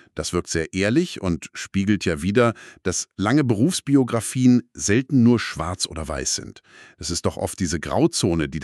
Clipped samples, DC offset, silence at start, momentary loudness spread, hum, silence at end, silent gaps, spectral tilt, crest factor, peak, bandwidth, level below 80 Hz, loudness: under 0.1%; under 0.1%; 0.15 s; 9 LU; none; 0 s; none; -5 dB/octave; 16 dB; -4 dBFS; 13 kHz; -44 dBFS; -22 LUFS